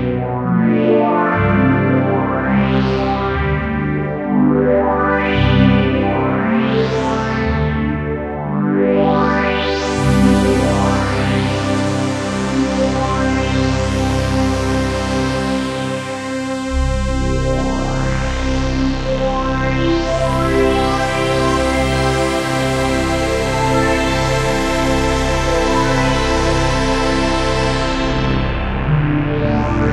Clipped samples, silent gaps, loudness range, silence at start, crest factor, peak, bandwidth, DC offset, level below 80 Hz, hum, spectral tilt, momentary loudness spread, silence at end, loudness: under 0.1%; none; 4 LU; 0 s; 16 dB; 0 dBFS; 13.5 kHz; under 0.1%; -24 dBFS; none; -6 dB/octave; 5 LU; 0 s; -16 LUFS